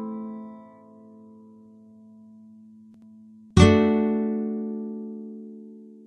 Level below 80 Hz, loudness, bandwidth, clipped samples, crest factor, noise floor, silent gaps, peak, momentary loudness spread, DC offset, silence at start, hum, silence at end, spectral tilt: -40 dBFS; -23 LUFS; 10.5 kHz; under 0.1%; 24 dB; -50 dBFS; none; -2 dBFS; 26 LU; under 0.1%; 0 s; none; 0.15 s; -7 dB/octave